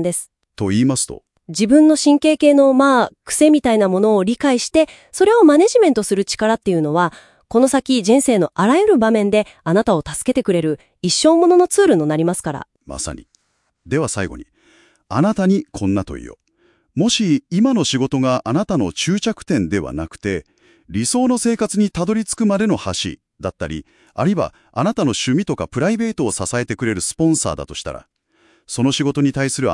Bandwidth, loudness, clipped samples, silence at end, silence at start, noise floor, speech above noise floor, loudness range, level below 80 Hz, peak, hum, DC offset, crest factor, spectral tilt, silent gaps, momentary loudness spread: 12 kHz; -16 LUFS; under 0.1%; 0 s; 0 s; -67 dBFS; 51 dB; 7 LU; -48 dBFS; 0 dBFS; none; under 0.1%; 16 dB; -5 dB/octave; none; 14 LU